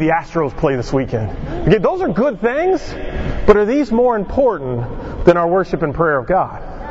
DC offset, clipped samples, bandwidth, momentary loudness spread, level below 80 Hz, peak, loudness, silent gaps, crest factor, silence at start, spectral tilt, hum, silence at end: under 0.1%; under 0.1%; 8 kHz; 11 LU; -30 dBFS; 0 dBFS; -17 LUFS; none; 16 dB; 0 s; -8 dB/octave; none; 0 s